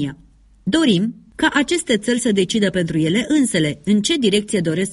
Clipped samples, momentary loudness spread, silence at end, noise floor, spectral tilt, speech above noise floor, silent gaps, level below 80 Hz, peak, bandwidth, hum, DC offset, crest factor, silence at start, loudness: under 0.1%; 4 LU; 0 s; -49 dBFS; -4.5 dB/octave; 32 dB; none; -50 dBFS; -2 dBFS; 11.5 kHz; none; under 0.1%; 16 dB; 0 s; -18 LUFS